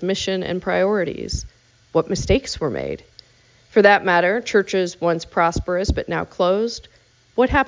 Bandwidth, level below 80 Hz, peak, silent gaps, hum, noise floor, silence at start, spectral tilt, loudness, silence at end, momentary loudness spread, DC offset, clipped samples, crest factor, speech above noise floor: 7.6 kHz; -36 dBFS; -2 dBFS; none; none; -54 dBFS; 0 s; -5 dB/octave; -20 LUFS; 0 s; 12 LU; under 0.1%; under 0.1%; 20 dB; 35 dB